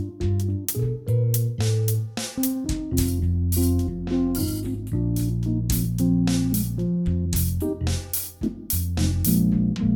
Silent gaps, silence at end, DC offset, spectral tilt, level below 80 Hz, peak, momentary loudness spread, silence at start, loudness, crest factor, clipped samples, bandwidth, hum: none; 0 s; under 0.1%; -6 dB/octave; -34 dBFS; -8 dBFS; 5 LU; 0 s; -24 LUFS; 14 dB; under 0.1%; 19.5 kHz; none